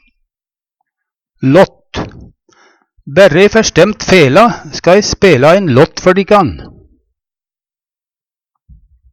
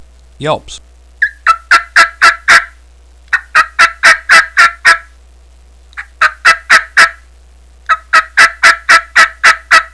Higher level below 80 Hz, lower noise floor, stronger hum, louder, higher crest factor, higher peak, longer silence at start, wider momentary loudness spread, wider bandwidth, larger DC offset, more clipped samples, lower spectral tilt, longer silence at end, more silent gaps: about the same, -38 dBFS vs -40 dBFS; first, under -90 dBFS vs -40 dBFS; neither; about the same, -8 LUFS vs -7 LUFS; about the same, 12 dB vs 10 dB; about the same, 0 dBFS vs 0 dBFS; first, 1.4 s vs 0.4 s; about the same, 13 LU vs 12 LU; first, 16 kHz vs 11 kHz; second, under 0.1% vs 0.4%; second, 0.3% vs 3%; first, -5 dB/octave vs 0 dB/octave; first, 2.45 s vs 0.05 s; neither